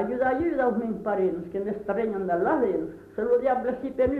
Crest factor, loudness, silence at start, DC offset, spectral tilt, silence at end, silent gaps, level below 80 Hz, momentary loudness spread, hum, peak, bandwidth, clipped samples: 14 dB; -26 LUFS; 0 s; under 0.1%; -9 dB/octave; 0 s; none; -52 dBFS; 8 LU; none; -12 dBFS; 4.4 kHz; under 0.1%